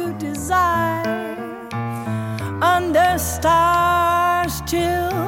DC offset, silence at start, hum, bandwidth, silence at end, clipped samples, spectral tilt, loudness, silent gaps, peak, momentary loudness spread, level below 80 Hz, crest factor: under 0.1%; 0 s; none; 17 kHz; 0 s; under 0.1%; -4.5 dB/octave; -19 LUFS; none; -4 dBFS; 11 LU; -38 dBFS; 14 dB